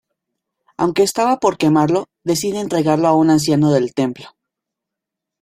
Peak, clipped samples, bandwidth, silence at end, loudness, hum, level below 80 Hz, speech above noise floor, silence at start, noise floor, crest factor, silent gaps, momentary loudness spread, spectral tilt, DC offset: -2 dBFS; under 0.1%; 16 kHz; 1.15 s; -16 LUFS; none; -56 dBFS; 67 dB; 0.8 s; -83 dBFS; 16 dB; none; 7 LU; -5.5 dB/octave; under 0.1%